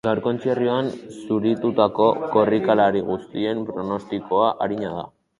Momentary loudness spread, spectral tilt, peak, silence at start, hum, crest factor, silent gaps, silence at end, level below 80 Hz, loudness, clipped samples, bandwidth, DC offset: 10 LU; -7.5 dB/octave; -2 dBFS; 0.05 s; none; 20 dB; none; 0.3 s; -58 dBFS; -22 LUFS; under 0.1%; 11 kHz; under 0.1%